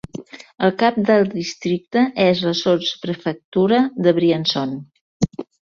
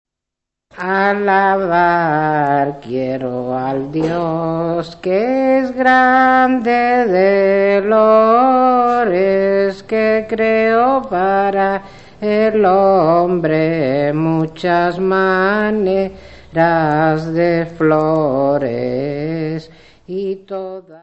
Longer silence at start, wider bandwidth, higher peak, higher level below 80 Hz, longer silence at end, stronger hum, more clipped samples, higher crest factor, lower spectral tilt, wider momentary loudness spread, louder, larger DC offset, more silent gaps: second, 0.15 s vs 0.75 s; second, 7.4 kHz vs 8.2 kHz; about the same, -2 dBFS vs 0 dBFS; about the same, -52 dBFS vs -50 dBFS; first, 0.25 s vs 0.05 s; neither; neither; about the same, 16 dB vs 14 dB; second, -6 dB/octave vs -8 dB/octave; about the same, 9 LU vs 10 LU; second, -19 LUFS vs -15 LUFS; second, under 0.1% vs 0.4%; first, 3.44-3.52 s, 5.01-5.20 s vs none